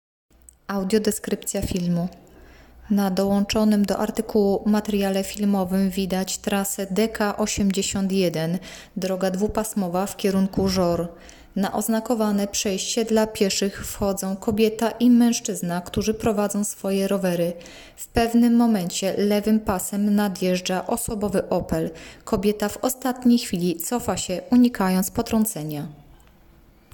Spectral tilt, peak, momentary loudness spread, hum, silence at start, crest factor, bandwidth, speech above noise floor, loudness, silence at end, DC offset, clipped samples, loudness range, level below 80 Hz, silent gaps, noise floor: -5 dB/octave; -8 dBFS; 8 LU; none; 0.7 s; 16 dB; 18 kHz; 31 dB; -23 LUFS; 0.9 s; under 0.1%; under 0.1%; 2 LU; -46 dBFS; none; -53 dBFS